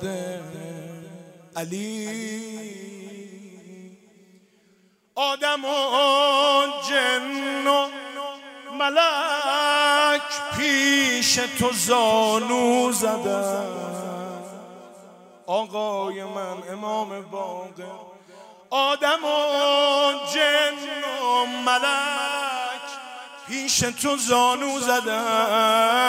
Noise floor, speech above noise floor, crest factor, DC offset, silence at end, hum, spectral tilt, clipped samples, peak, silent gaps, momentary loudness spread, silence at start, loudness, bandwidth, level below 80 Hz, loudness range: -61 dBFS; 39 dB; 18 dB; under 0.1%; 0 s; none; -2 dB/octave; under 0.1%; -6 dBFS; none; 19 LU; 0 s; -22 LUFS; 16 kHz; -64 dBFS; 13 LU